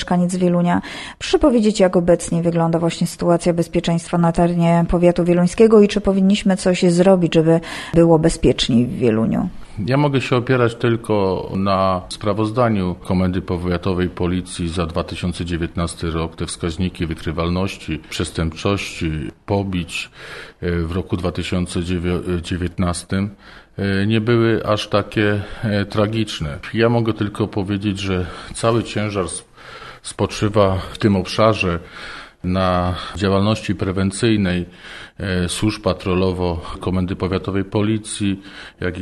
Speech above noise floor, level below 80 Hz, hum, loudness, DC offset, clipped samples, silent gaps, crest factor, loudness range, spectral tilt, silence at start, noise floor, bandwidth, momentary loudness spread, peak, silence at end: 19 dB; -38 dBFS; none; -19 LUFS; under 0.1%; under 0.1%; none; 18 dB; 8 LU; -6 dB/octave; 0 s; -37 dBFS; 12.5 kHz; 10 LU; 0 dBFS; 0 s